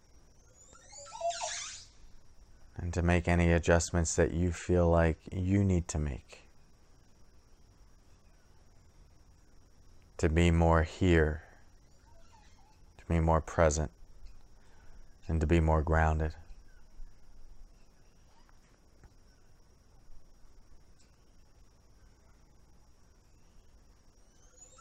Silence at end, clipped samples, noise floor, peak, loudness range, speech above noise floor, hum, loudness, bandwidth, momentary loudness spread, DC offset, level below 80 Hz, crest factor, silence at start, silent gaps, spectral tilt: 4.05 s; under 0.1%; -60 dBFS; -12 dBFS; 8 LU; 32 dB; none; -30 LUFS; 9.4 kHz; 17 LU; under 0.1%; -42 dBFS; 22 dB; 0.9 s; none; -6 dB/octave